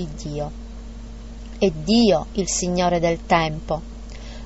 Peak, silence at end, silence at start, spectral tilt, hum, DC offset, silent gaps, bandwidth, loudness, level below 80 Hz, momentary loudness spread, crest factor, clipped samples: -6 dBFS; 0 s; 0 s; -4.5 dB/octave; none; 0.3%; none; 8 kHz; -21 LUFS; -36 dBFS; 21 LU; 18 dB; under 0.1%